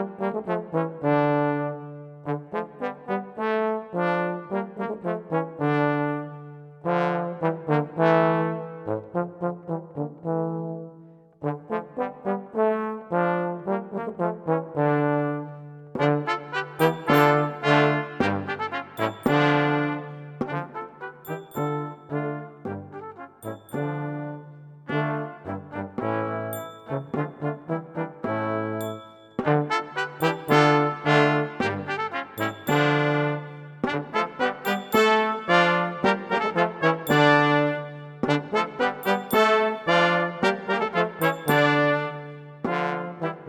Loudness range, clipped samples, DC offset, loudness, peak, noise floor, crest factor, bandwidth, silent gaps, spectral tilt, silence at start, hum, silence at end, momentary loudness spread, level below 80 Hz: 9 LU; under 0.1%; under 0.1%; -25 LUFS; -2 dBFS; -49 dBFS; 22 dB; 17.5 kHz; none; -6.5 dB/octave; 0 s; none; 0 s; 14 LU; -66 dBFS